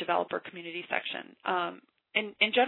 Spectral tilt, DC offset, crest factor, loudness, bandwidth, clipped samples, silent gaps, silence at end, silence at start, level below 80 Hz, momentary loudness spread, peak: -6.5 dB/octave; under 0.1%; 22 dB; -32 LUFS; 4.2 kHz; under 0.1%; none; 0 s; 0 s; -86 dBFS; 11 LU; -10 dBFS